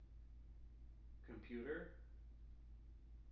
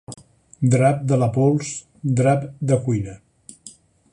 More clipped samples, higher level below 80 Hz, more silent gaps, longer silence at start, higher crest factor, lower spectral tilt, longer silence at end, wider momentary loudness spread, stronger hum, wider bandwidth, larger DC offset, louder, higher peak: neither; second, -60 dBFS vs -52 dBFS; neither; about the same, 0 s vs 0.1 s; about the same, 20 dB vs 18 dB; about the same, -6.5 dB/octave vs -7 dB/octave; second, 0 s vs 0.45 s; second, 14 LU vs 17 LU; neither; second, 5.8 kHz vs 11 kHz; neither; second, -57 LUFS vs -20 LUFS; second, -36 dBFS vs -4 dBFS